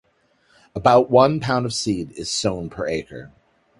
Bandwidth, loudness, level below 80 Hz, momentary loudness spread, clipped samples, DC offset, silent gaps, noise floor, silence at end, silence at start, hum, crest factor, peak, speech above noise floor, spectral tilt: 11.5 kHz; -20 LUFS; -50 dBFS; 16 LU; under 0.1%; under 0.1%; none; -62 dBFS; 0.5 s; 0.75 s; none; 20 dB; 0 dBFS; 42 dB; -5 dB/octave